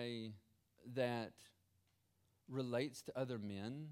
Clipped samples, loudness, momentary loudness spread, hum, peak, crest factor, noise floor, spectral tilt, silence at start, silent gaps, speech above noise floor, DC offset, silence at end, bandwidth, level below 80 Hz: under 0.1%; -45 LUFS; 16 LU; none; -26 dBFS; 20 dB; -80 dBFS; -6 dB/octave; 0 s; none; 36 dB; under 0.1%; 0 s; 16.5 kHz; -86 dBFS